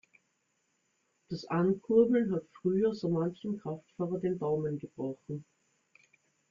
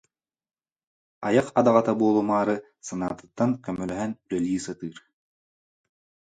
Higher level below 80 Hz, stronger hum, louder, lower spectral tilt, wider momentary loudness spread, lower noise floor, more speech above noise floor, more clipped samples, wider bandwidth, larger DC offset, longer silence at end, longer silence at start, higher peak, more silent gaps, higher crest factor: second, -72 dBFS vs -62 dBFS; neither; second, -32 LUFS vs -25 LUFS; first, -9 dB/octave vs -6.5 dB/octave; about the same, 15 LU vs 13 LU; second, -77 dBFS vs under -90 dBFS; second, 46 dB vs over 66 dB; neither; second, 7.4 kHz vs 9.4 kHz; neither; second, 1.1 s vs 1.4 s; about the same, 1.3 s vs 1.2 s; second, -14 dBFS vs -6 dBFS; neither; about the same, 20 dB vs 20 dB